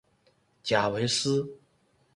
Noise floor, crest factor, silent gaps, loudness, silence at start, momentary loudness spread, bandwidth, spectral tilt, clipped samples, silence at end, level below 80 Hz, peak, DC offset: -67 dBFS; 20 dB; none; -27 LUFS; 0.65 s; 12 LU; 11.5 kHz; -4 dB/octave; under 0.1%; 0.6 s; -66 dBFS; -10 dBFS; under 0.1%